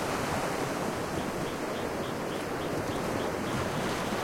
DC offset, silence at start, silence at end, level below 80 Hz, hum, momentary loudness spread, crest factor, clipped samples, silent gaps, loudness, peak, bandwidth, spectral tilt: under 0.1%; 0 s; 0 s; -52 dBFS; none; 3 LU; 14 dB; under 0.1%; none; -32 LUFS; -18 dBFS; 16.5 kHz; -4.5 dB/octave